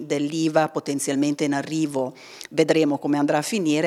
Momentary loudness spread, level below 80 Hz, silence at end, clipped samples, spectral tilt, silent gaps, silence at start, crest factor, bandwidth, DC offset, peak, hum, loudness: 7 LU; -74 dBFS; 0 s; under 0.1%; -5 dB/octave; none; 0 s; 18 dB; 14 kHz; under 0.1%; -4 dBFS; none; -23 LUFS